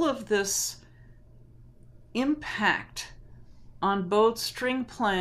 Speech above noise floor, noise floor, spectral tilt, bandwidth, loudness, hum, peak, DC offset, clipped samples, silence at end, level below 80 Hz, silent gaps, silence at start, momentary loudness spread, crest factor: 25 dB; -52 dBFS; -3 dB/octave; 15.5 kHz; -28 LUFS; none; -10 dBFS; under 0.1%; under 0.1%; 0 s; -54 dBFS; none; 0 s; 14 LU; 20 dB